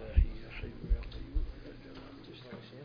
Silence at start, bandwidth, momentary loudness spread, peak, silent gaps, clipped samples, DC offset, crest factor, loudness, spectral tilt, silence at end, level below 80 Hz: 0 s; 5.2 kHz; 16 LU; -14 dBFS; none; under 0.1%; under 0.1%; 22 dB; -41 LUFS; -8.5 dB/octave; 0 s; -36 dBFS